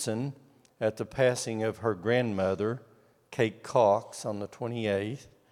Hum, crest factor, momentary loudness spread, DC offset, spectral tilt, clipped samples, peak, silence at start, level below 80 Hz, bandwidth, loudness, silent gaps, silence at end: none; 20 dB; 11 LU; under 0.1%; -5.5 dB/octave; under 0.1%; -10 dBFS; 0 s; -68 dBFS; 15.5 kHz; -30 LUFS; none; 0.25 s